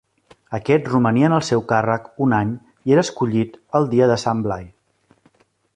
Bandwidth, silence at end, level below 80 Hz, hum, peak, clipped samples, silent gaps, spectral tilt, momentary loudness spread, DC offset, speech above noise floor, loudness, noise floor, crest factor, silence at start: 10 kHz; 1.1 s; -52 dBFS; none; -2 dBFS; under 0.1%; none; -6.5 dB/octave; 10 LU; under 0.1%; 42 dB; -19 LUFS; -60 dBFS; 18 dB; 0.5 s